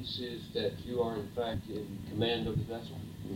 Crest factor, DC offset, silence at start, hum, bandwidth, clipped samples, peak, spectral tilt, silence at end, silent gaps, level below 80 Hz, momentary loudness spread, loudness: 18 dB; under 0.1%; 0 s; none; 17 kHz; under 0.1%; -18 dBFS; -6.5 dB/octave; 0 s; none; -54 dBFS; 9 LU; -36 LUFS